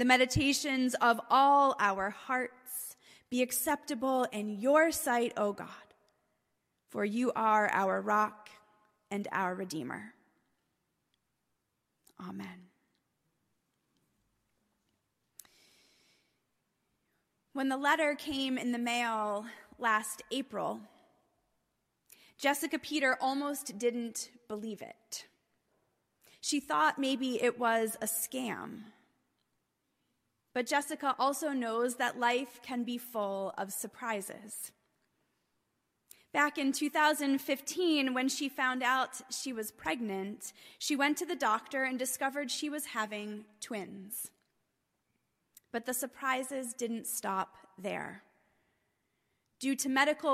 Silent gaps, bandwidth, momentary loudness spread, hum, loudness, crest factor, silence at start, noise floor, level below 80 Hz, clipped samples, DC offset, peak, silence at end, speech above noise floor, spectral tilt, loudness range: none; 15.5 kHz; 14 LU; none; -32 LUFS; 22 dB; 0 s; -82 dBFS; -66 dBFS; under 0.1%; under 0.1%; -12 dBFS; 0 s; 50 dB; -3 dB/octave; 10 LU